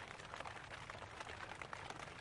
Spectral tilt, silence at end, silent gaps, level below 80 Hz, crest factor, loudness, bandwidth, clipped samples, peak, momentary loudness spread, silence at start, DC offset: -3.5 dB/octave; 0 s; none; -68 dBFS; 20 dB; -50 LUFS; 11.5 kHz; under 0.1%; -30 dBFS; 2 LU; 0 s; under 0.1%